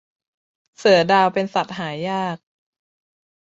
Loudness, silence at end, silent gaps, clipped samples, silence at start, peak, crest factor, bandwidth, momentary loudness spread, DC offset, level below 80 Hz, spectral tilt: -19 LUFS; 1.15 s; none; under 0.1%; 0.8 s; -2 dBFS; 20 dB; 8 kHz; 13 LU; under 0.1%; -64 dBFS; -5 dB/octave